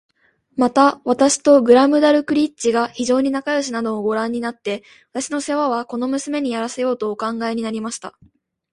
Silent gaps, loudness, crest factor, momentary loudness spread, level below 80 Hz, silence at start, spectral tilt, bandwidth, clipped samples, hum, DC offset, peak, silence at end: none; -18 LUFS; 18 dB; 14 LU; -60 dBFS; 0.55 s; -3.5 dB/octave; 11.5 kHz; under 0.1%; none; under 0.1%; 0 dBFS; 0.65 s